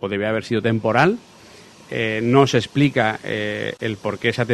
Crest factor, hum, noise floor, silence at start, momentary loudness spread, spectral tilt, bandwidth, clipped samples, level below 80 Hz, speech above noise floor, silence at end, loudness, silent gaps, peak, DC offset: 20 dB; none; -45 dBFS; 0 s; 9 LU; -6 dB/octave; 12.5 kHz; under 0.1%; -56 dBFS; 25 dB; 0 s; -20 LUFS; none; 0 dBFS; under 0.1%